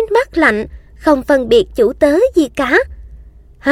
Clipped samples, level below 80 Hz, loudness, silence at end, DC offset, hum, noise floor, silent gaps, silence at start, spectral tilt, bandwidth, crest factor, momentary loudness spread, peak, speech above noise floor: under 0.1%; -36 dBFS; -13 LUFS; 0 s; under 0.1%; none; -39 dBFS; none; 0 s; -5 dB/octave; 15.5 kHz; 14 dB; 9 LU; 0 dBFS; 26 dB